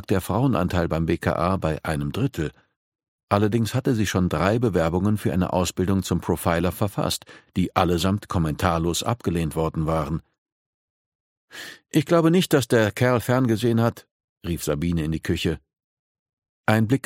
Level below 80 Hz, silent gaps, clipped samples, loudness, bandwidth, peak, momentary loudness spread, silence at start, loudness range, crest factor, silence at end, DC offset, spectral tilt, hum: -42 dBFS; 2.76-2.92 s, 3.08-3.27 s, 10.38-10.46 s, 10.52-11.48 s, 14.11-14.36 s, 15.84-16.26 s, 16.33-16.37 s, 16.49-16.64 s; under 0.1%; -23 LUFS; 16.5 kHz; -2 dBFS; 9 LU; 0 s; 5 LU; 22 dB; 0.05 s; under 0.1%; -6 dB/octave; none